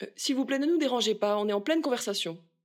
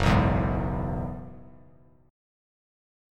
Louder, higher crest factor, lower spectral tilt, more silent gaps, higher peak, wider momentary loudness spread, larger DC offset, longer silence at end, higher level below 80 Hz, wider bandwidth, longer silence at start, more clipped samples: about the same, -28 LUFS vs -27 LUFS; second, 14 dB vs 22 dB; second, -3.5 dB/octave vs -7.5 dB/octave; neither; second, -16 dBFS vs -8 dBFS; second, 5 LU vs 18 LU; neither; second, 0.3 s vs 1.6 s; second, -88 dBFS vs -36 dBFS; first, 16.5 kHz vs 12.5 kHz; about the same, 0 s vs 0 s; neither